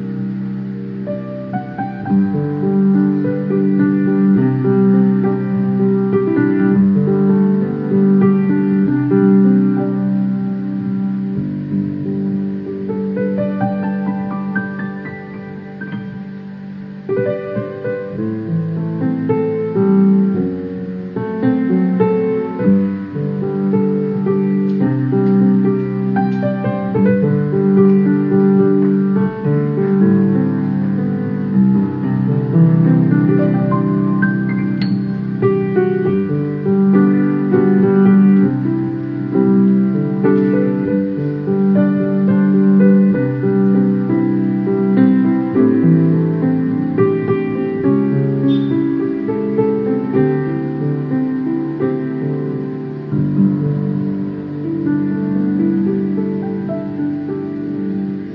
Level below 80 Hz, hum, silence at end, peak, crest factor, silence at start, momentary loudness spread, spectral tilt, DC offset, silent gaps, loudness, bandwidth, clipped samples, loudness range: -54 dBFS; none; 0 s; 0 dBFS; 14 dB; 0 s; 10 LU; -12 dB/octave; under 0.1%; none; -16 LUFS; 4.7 kHz; under 0.1%; 6 LU